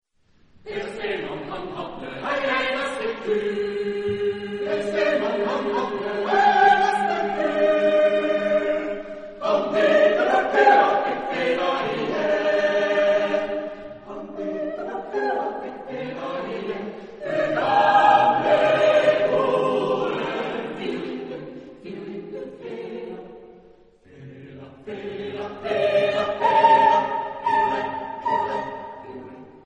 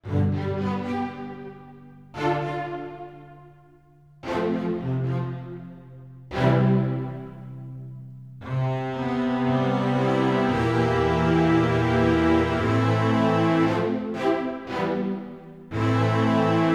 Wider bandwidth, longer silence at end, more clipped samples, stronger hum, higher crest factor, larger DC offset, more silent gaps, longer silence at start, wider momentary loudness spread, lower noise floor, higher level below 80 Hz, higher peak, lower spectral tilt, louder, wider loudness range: about the same, 10 kHz vs 10 kHz; about the same, 0.05 s vs 0 s; neither; neither; about the same, 20 dB vs 16 dB; second, under 0.1% vs 0.1%; neither; first, 0.65 s vs 0.05 s; about the same, 18 LU vs 19 LU; first, -59 dBFS vs -54 dBFS; second, -58 dBFS vs -48 dBFS; first, -4 dBFS vs -8 dBFS; second, -5 dB/octave vs -8 dB/octave; about the same, -22 LUFS vs -24 LUFS; about the same, 12 LU vs 10 LU